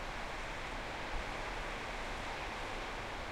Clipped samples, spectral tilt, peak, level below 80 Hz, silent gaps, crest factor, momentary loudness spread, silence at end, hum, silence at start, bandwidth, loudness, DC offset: under 0.1%; -3.5 dB/octave; -26 dBFS; -48 dBFS; none; 14 dB; 1 LU; 0 s; none; 0 s; 16 kHz; -42 LUFS; under 0.1%